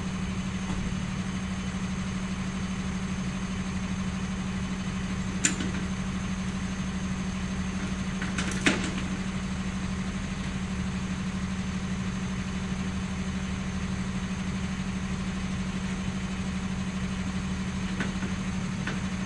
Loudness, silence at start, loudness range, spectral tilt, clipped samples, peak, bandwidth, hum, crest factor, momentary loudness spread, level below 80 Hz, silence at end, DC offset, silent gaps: -31 LUFS; 0 s; 2 LU; -5 dB/octave; under 0.1%; -6 dBFS; 11.5 kHz; none; 24 dB; 2 LU; -40 dBFS; 0 s; under 0.1%; none